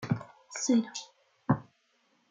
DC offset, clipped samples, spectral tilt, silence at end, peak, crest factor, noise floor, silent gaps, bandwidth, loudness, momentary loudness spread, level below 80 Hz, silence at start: under 0.1%; under 0.1%; -5 dB/octave; 0.7 s; -12 dBFS; 20 dB; -71 dBFS; none; 9.4 kHz; -32 LUFS; 15 LU; -66 dBFS; 0 s